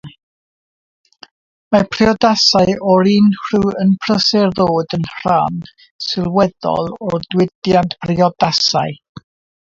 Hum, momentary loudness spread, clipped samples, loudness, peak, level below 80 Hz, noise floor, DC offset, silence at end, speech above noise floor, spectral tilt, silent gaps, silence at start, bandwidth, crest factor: none; 10 LU; under 0.1%; -15 LUFS; 0 dBFS; -46 dBFS; under -90 dBFS; under 0.1%; 0.7 s; over 76 dB; -5.5 dB/octave; 0.23-1.04 s, 1.31-1.71 s, 5.91-5.99 s, 7.55-7.62 s; 0.05 s; 7.6 kHz; 16 dB